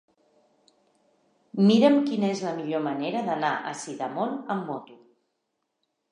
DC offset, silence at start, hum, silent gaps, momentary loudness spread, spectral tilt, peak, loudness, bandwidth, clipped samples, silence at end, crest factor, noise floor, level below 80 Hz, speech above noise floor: under 0.1%; 1.55 s; none; none; 15 LU; -6 dB/octave; -8 dBFS; -25 LUFS; 10.5 kHz; under 0.1%; 1.15 s; 20 dB; -79 dBFS; -82 dBFS; 54 dB